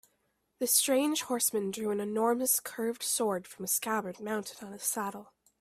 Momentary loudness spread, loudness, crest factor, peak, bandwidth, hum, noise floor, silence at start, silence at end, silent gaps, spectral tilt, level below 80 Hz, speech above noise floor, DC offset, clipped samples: 10 LU; -30 LUFS; 22 dB; -10 dBFS; 16 kHz; none; -77 dBFS; 0.6 s; 0.35 s; none; -2.5 dB/octave; -76 dBFS; 45 dB; under 0.1%; under 0.1%